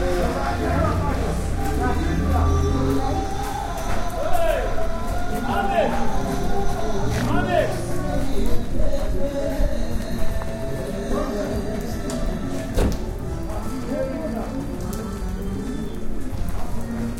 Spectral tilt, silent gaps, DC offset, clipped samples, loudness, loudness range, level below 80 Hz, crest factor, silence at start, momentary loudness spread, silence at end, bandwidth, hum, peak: -6.5 dB/octave; none; under 0.1%; under 0.1%; -25 LUFS; 5 LU; -26 dBFS; 16 dB; 0 s; 8 LU; 0 s; 15.5 kHz; none; -6 dBFS